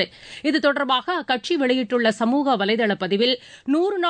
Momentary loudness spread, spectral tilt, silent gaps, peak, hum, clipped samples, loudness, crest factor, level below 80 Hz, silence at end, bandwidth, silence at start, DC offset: 4 LU; -5 dB/octave; none; -8 dBFS; none; under 0.1%; -21 LUFS; 14 dB; -66 dBFS; 0 s; 9.4 kHz; 0 s; under 0.1%